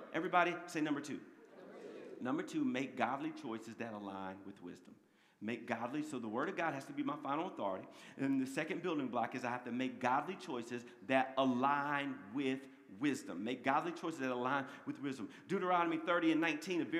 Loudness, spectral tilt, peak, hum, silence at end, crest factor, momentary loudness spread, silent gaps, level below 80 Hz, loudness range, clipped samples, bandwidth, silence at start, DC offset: -39 LUFS; -5.5 dB/octave; -16 dBFS; none; 0 s; 22 dB; 14 LU; none; under -90 dBFS; 6 LU; under 0.1%; 14 kHz; 0 s; under 0.1%